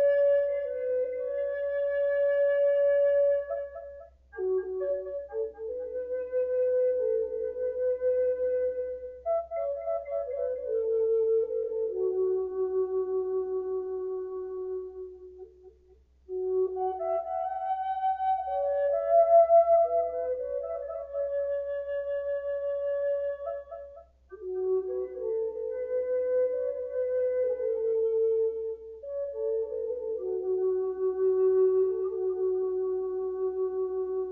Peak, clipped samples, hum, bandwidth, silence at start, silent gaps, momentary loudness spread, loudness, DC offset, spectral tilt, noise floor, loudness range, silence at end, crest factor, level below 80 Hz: -12 dBFS; under 0.1%; none; 3.6 kHz; 0 s; none; 12 LU; -29 LUFS; under 0.1%; -5.5 dB/octave; -60 dBFS; 8 LU; 0 s; 16 dB; -62 dBFS